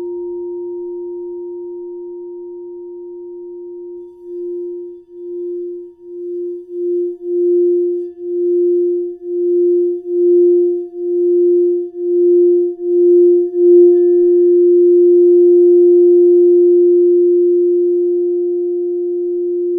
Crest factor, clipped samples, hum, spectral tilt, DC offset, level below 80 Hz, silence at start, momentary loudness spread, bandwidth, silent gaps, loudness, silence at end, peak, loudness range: 12 dB; under 0.1%; none; -12 dB/octave; under 0.1%; -68 dBFS; 0 s; 21 LU; 1 kHz; none; -12 LUFS; 0 s; -2 dBFS; 19 LU